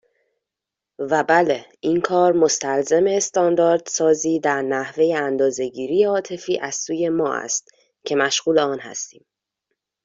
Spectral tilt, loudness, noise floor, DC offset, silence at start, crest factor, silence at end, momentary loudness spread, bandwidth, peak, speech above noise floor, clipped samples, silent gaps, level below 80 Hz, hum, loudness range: -3.5 dB/octave; -20 LUFS; -86 dBFS; under 0.1%; 1 s; 18 dB; 0.95 s; 8 LU; 7.8 kHz; -4 dBFS; 66 dB; under 0.1%; none; -66 dBFS; none; 4 LU